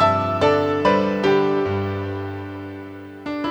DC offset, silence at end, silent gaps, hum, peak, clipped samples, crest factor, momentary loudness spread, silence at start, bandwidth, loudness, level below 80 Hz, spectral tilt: under 0.1%; 0 s; none; none; -4 dBFS; under 0.1%; 16 dB; 16 LU; 0 s; over 20 kHz; -20 LUFS; -54 dBFS; -7 dB/octave